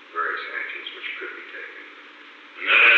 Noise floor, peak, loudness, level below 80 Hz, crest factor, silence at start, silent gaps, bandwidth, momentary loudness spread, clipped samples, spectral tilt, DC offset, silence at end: -45 dBFS; -6 dBFS; -24 LUFS; under -90 dBFS; 18 dB; 0.1 s; none; 7.8 kHz; 22 LU; under 0.1%; 0.5 dB/octave; under 0.1%; 0 s